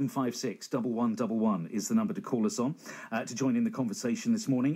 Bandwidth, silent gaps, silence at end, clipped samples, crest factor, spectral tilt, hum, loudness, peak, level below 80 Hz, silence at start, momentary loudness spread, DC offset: 15.5 kHz; none; 0 s; under 0.1%; 14 dB; -5.5 dB/octave; none; -31 LUFS; -18 dBFS; -84 dBFS; 0 s; 6 LU; under 0.1%